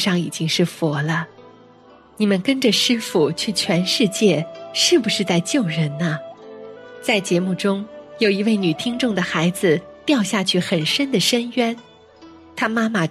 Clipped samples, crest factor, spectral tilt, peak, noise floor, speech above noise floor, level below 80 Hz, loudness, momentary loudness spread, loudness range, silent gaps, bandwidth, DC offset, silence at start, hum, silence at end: under 0.1%; 16 dB; -4.5 dB/octave; -4 dBFS; -48 dBFS; 29 dB; -62 dBFS; -19 LUFS; 9 LU; 4 LU; none; 14 kHz; under 0.1%; 0 s; none; 0 s